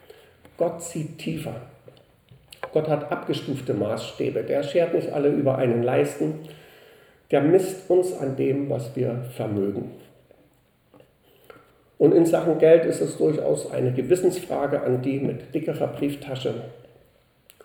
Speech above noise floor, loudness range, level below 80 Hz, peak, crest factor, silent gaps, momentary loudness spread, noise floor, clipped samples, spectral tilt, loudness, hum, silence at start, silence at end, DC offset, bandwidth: 38 dB; 8 LU; -64 dBFS; -4 dBFS; 20 dB; none; 12 LU; -61 dBFS; under 0.1%; -7 dB/octave; -24 LUFS; none; 0.6 s; 0.9 s; under 0.1%; 19.5 kHz